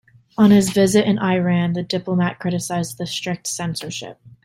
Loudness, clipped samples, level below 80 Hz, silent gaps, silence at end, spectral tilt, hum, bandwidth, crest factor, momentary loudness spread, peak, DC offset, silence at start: -19 LUFS; under 0.1%; -54 dBFS; none; 0.15 s; -5.5 dB/octave; none; 15.5 kHz; 16 dB; 13 LU; -2 dBFS; under 0.1%; 0.4 s